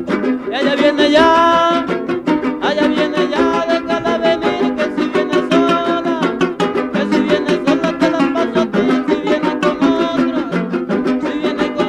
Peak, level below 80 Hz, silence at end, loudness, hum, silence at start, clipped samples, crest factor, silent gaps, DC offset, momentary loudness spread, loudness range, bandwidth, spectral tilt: -2 dBFS; -48 dBFS; 0 s; -15 LUFS; none; 0 s; under 0.1%; 14 dB; none; under 0.1%; 6 LU; 2 LU; 11 kHz; -5.5 dB/octave